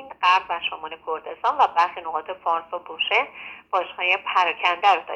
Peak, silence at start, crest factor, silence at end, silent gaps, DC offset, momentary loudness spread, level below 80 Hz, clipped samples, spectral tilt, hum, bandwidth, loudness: -4 dBFS; 0 s; 18 dB; 0 s; none; under 0.1%; 11 LU; -68 dBFS; under 0.1%; -1.5 dB/octave; none; 8.6 kHz; -22 LUFS